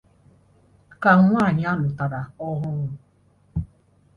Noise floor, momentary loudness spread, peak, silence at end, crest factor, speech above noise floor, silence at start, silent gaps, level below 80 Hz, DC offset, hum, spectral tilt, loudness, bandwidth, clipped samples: -59 dBFS; 17 LU; 0 dBFS; 0.5 s; 22 dB; 39 dB; 1 s; none; -46 dBFS; under 0.1%; none; -9 dB/octave; -22 LUFS; 6.4 kHz; under 0.1%